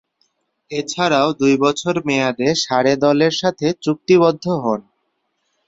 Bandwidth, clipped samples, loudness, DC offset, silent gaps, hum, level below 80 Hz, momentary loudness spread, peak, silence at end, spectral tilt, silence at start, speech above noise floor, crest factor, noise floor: 8 kHz; under 0.1%; -17 LUFS; under 0.1%; none; none; -58 dBFS; 9 LU; -2 dBFS; 0.85 s; -5 dB/octave; 0.7 s; 53 dB; 16 dB; -70 dBFS